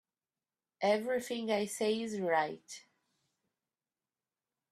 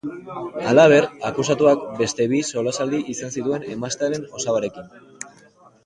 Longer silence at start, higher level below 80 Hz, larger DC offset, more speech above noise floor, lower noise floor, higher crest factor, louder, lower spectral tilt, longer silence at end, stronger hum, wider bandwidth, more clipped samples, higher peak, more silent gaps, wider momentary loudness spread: first, 0.8 s vs 0.05 s; second, -82 dBFS vs -60 dBFS; neither; first, over 57 dB vs 32 dB; first, under -90 dBFS vs -52 dBFS; about the same, 20 dB vs 20 dB; second, -34 LUFS vs -20 LUFS; about the same, -4 dB/octave vs -4.5 dB/octave; first, 1.9 s vs 0.55 s; neither; first, 14 kHz vs 11 kHz; neither; second, -18 dBFS vs -2 dBFS; neither; second, 14 LU vs 18 LU